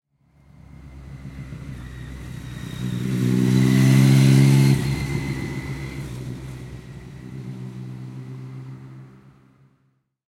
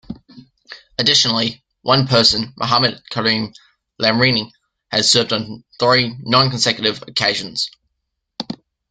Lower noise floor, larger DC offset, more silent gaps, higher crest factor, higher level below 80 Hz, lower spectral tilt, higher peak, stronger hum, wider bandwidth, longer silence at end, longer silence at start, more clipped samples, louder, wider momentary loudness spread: second, -67 dBFS vs -75 dBFS; neither; neither; about the same, 18 dB vs 18 dB; first, -44 dBFS vs -52 dBFS; first, -6.5 dB/octave vs -3.5 dB/octave; second, -4 dBFS vs 0 dBFS; neither; first, 15.5 kHz vs 9.4 kHz; first, 1.25 s vs 0.35 s; first, 0.8 s vs 0.1 s; neither; second, -19 LUFS vs -16 LUFS; first, 24 LU vs 17 LU